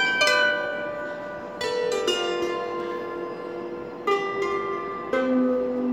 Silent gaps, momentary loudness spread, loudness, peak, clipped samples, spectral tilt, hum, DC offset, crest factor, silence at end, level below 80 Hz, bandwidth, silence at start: none; 13 LU; -26 LUFS; -8 dBFS; under 0.1%; -3 dB/octave; none; under 0.1%; 18 dB; 0 s; -60 dBFS; 16 kHz; 0 s